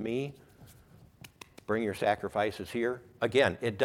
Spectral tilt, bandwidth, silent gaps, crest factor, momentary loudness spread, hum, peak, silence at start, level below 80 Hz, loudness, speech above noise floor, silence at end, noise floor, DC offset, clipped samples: -5.5 dB/octave; 17 kHz; none; 22 dB; 17 LU; none; -10 dBFS; 0 s; -64 dBFS; -31 LUFS; 27 dB; 0 s; -57 dBFS; under 0.1%; under 0.1%